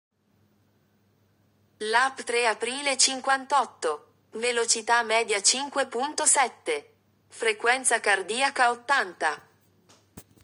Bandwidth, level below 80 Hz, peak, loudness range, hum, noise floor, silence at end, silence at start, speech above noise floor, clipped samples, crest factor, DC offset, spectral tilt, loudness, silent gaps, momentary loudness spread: over 20 kHz; -78 dBFS; -6 dBFS; 2 LU; none; -66 dBFS; 0.2 s; 1.8 s; 41 dB; under 0.1%; 22 dB; under 0.1%; 1 dB/octave; -24 LUFS; none; 10 LU